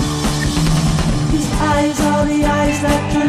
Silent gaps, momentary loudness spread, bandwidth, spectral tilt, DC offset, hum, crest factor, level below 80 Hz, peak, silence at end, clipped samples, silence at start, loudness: none; 2 LU; 16 kHz; -5.5 dB/octave; under 0.1%; none; 12 dB; -24 dBFS; -2 dBFS; 0 s; under 0.1%; 0 s; -16 LUFS